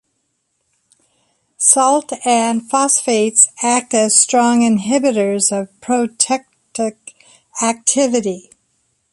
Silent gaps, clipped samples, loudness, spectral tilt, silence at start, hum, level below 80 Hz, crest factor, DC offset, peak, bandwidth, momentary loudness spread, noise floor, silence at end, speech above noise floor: none; under 0.1%; -14 LUFS; -2.5 dB/octave; 1.6 s; none; -64 dBFS; 16 dB; under 0.1%; 0 dBFS; 11.5 kHz; 12 LU; -68 dBFS; 0.75 s; 53 dB